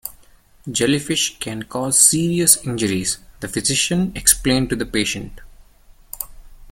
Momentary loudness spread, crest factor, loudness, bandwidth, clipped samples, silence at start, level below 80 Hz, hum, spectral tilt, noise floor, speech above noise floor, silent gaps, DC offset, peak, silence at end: 18 LU; 20 dB; -17 LUFS; 17 kHz; under 0.1%; 0.05 s; -42 dBFS; none; -2.5 dB/octave; -49 dBFS; 30 dB; none; under 0.1%; 0 dBFS; 0 s